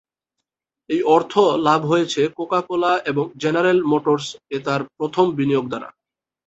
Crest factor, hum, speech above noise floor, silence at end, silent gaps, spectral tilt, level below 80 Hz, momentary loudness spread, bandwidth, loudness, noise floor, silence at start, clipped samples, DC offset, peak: 18 dB; none; 62 dB; 0.55 s; none; -5.5 dB/octave; -62 dBFS; 9 LU; 8.2 kHz; -19 LUFS; -81 dBFS; 0.9 s; under 0.1%; under 0.1%; -2 dBFS